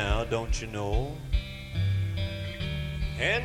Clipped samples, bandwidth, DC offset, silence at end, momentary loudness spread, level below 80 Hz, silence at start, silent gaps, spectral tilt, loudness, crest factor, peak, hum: under 0.1%; 13.5 kHz; under 0.1%; 0 s; 5 LU; -34 dBFS; 0 s; none; -5.5 dB/octave; -31 LUFS; 18 dB; -12 dBFS; none